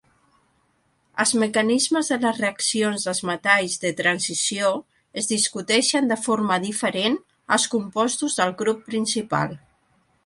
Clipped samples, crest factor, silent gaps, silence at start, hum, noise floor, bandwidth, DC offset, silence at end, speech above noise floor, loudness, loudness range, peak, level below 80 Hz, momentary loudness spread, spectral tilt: under 0.1%; 20 dB; none; 1.15 s; none; -66 dBFS; 11.5 kHz; under 0.1%; 0.7 s; 44 dB; -22 LUFS; 2 LU; -4 dBFS; -66 dBFS; 6 LU; -2.5 dB/octave